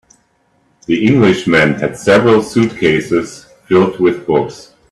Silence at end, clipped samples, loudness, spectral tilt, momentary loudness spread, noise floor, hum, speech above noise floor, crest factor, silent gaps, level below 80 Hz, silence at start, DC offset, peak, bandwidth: 0.3 s; under 0.1%; -12 LUFS; -6 dB/octave; 8 LU; -57 dBFS; none; 45 dB; 14 dB; none; -48 dBFS; 0.9 s; under 0.1%; 0 dBFS; 12.5 kHz